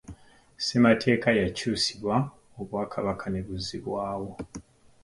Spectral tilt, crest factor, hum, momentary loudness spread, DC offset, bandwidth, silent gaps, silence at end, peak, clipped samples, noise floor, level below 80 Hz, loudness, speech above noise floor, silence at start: -5 dB/octave; 20 dB; none; 16 LU; under 0.1%; 11.5 kHz; none; 0.45 s; -8 dBFS; under 0.1%; -50 dBFS; -52 dBFS; -27 LUFS; 24 dB; 0.1 s